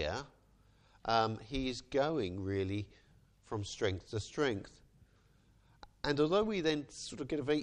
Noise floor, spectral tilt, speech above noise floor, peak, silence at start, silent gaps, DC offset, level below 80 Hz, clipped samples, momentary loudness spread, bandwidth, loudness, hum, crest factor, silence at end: -67 dBFS; -5.5 dB/octave; 32 dB; -16 dBFS; 0 s; none; under 0.1%; -58 dBFS; under 0.1%; 13 LU; 10.5 kHz; -36 LUFS; none; 20 dB; 0 s